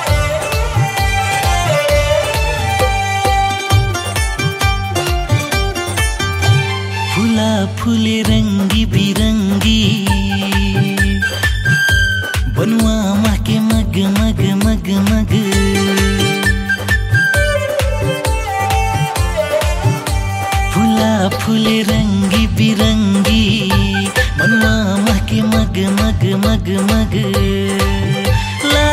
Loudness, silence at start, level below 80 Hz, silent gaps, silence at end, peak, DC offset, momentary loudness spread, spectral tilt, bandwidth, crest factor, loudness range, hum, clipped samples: -14 LUFS; 0 s; -22 dBFS; none; 0 s; -2 dBFS; under 0.1%; 4 LU; -5 dB/octave; 16 kHz; 12 dB; 2 LU; none; under 0.1%